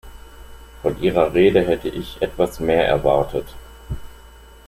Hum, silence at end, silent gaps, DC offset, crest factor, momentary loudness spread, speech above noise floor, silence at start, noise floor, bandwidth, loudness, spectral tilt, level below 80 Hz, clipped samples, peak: none; 0.4 s; none; under 0.1%; 18 dB; 19 LU; 25 dB; 0.05 s; -43 dBFS; 16 kHz; -19 LUFS; -6.5 dB/octave; -38 dBFS; under 0.1%; -2 dBFS